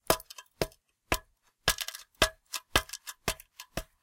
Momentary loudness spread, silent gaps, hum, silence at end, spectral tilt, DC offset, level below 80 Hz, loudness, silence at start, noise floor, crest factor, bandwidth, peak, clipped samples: 12 LU; none; none; 0.2 s; -2 dB/octave; under 0.1%; -46 dBFS; -33 LUFS; 0.1 s; -58 dBFS; 32 dB; 17 kHz; -2 dBFS; under 0.1%